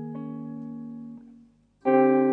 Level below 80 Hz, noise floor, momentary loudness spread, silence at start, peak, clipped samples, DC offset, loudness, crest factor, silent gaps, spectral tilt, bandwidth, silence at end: -72 dBFS; -56 dBFS; 22 LU; 0 s; -8 dBFS; under 0.1%; under 0.1%; -25 LUFS; 18 dB; none; -10.5 dB/octave; 4.1 kHz; 0 s